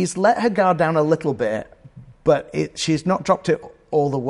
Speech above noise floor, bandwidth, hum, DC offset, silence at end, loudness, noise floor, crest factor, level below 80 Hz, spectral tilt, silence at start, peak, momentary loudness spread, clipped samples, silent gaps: 24 dB; 11.5 kHz; none; under 0.1%; 0 s; -20 LUFS; -44 dBFS; 16 dB; -52 dBFS; -5.5 dB/octave; 0 s; -4 dBFS; 7 LU; under 0.1%; none